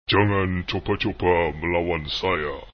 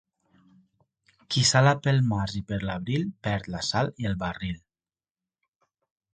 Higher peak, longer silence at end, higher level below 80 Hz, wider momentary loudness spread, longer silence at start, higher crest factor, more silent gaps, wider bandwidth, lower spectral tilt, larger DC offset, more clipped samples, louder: about the same, -6 dBFS vs -6 dBFS; second, 0.05 s vs 1.6 s; first, -40 dBFS vs -50 dBFS; second, 6 LU vs 11 LU; second, 0.1 s vs 1.3 s; second, 16 dB vs 22 dB; neither; second, 6.6 kHz vs 9.4 kHz; first, -7 dB/octave vs -4.5 dB/octave; neither; neither; first, -23 LUFS vs -26 LUFS